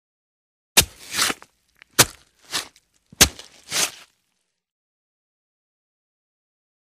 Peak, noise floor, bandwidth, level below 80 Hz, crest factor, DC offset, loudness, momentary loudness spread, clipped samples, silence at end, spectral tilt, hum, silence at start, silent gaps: 0 dBFS; -75 dBFS; 15.5 kHz; -44 dBFS; 26 dB; under 0.1%; -20 LUFS; 12 LU; under 0.1%; 3.1 s; -1 dB/octave; none; 0.75 s; none